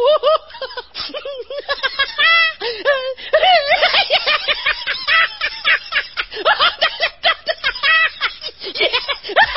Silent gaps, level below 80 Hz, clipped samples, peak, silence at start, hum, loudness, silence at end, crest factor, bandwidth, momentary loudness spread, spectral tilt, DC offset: none; -50 dBFS; under 0.1%; 0 dBFS; 0 s; none; -15 LUFS; 0 s; 16 dB; 5.8 kHz; 13 LU; -4 dB/octave; 0.4%